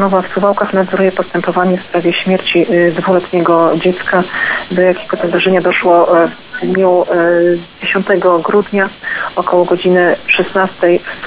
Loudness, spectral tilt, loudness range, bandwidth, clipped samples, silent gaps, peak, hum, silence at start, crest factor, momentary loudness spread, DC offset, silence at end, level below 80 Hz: -12 LUFS; -10 dB/octave; 1 LU; 4 kHz; under 0.1%; none; 0 dBFS; none; 0 s; 12 dB; 5 LU; under 0.1%; 0 s; -50 dBFS